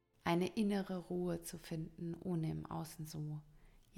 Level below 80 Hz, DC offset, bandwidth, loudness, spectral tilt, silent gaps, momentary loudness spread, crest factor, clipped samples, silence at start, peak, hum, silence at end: -64 dBFS; under 0.1%; 18 kHz; -41 LUFS; -6.5 dB/octave; none; 10 LU; 20 dB; under 0.1%; 0.25 s; -22 dBFS; none; 0 s